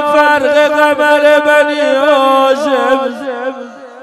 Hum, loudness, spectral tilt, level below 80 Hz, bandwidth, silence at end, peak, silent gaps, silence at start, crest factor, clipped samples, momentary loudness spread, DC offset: none; -10 LUFS; -2.5 dB/octave; -58 dBFS; 13.5 kHz; 0 s; 0 dBFS; none; 0 s; 10 dB; 0.4%; 12 LU; under 0.1%